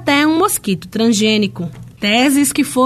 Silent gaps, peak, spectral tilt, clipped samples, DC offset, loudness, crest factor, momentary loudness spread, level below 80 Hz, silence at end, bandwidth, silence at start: none; -2 dBFS; -3.5 dB/octave; under 0.1%; under 0.1%; -14 LUFS; 14 dB; 9 LU; -50 dBFS; 0 s; 14 kHz; 0 s